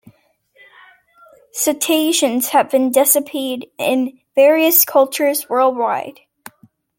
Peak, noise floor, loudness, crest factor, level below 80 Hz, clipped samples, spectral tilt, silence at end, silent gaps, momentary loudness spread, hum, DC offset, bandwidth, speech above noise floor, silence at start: 0 dBFS; -57 dBFS; -15 LUFS; 18 dB; -68 dBFS; under 0.1%; -1.5 dB/octave; 0.85 s; none; 12 LU; none; under 0.1%; 17 kHz; 41 dB; 1.55 s